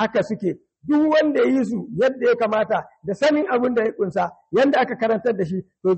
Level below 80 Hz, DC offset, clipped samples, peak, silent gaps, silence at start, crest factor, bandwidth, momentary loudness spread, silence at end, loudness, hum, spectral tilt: -62 dBFS; under 0.1%; under 0.1%; -8 dBFS; none; 0 s; 12 dB; 8.4 kHz; 8 LU; 0 s; -21 LUFS; none; -6.5 dB/octave